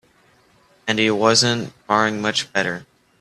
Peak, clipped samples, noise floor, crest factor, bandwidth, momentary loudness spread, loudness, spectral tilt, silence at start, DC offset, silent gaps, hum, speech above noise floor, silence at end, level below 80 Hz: 0 dBFS; under 0.1%; -56 dBFS; 20 dB; 13 kHz; 11 LU; -19 LUFS; -3 dB/octave; 0.85 s; under 0.1%; none; none; 37 dB; 0.4 s; -60 dBFS